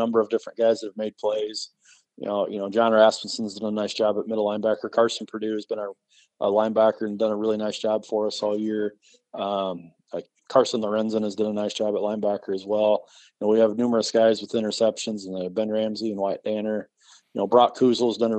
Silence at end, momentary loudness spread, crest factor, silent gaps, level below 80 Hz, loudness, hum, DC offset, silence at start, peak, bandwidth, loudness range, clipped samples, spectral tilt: 0 s; 12 LU; 20 dB; none; -76 dBFS; -24 LUFS; none; under 0.1%; 0 s; -4 dBFS; 9 kHz; 3 LU; under 0.1%; -5 dB/octave